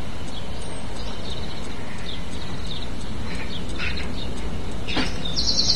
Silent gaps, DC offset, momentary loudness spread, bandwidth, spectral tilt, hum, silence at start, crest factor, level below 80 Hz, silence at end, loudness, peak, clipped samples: none; 9%; 9 LU; 12 kHz; -3.5 dB/octave; none; 0 s; 24 dB; -36 dBFS; 0 s; -29 LUFS; -6 dBFS; under 0.1%